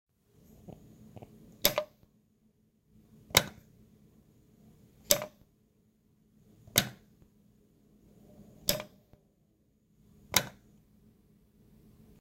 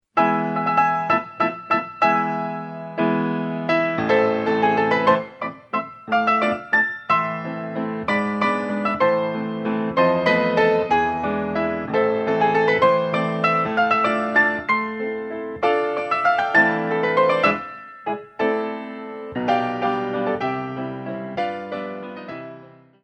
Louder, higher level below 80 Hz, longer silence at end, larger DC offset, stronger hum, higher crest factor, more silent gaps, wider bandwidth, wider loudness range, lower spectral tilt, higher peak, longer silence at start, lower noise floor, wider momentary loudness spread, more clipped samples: second, -30 LUFS vs -21 LUFS; about the same, -62 dBFS vs -58 dBFS; first, 1.7 s vs 0.35 s; neither; neither; first, 38 dB vs 18 dB; neither; first, 16 kHz vs 8.2 kHz; about the same, 5 LU vs 5 LU; second, -1.5 dB/octave vs -7 dB/octave; about the same, -2 dBFS vs -4 dBFS; first, 0.7 s vs 0.15 s; first, -70 dBFS vs -45 dBFS; first, 26 LU vs 12 LU; neither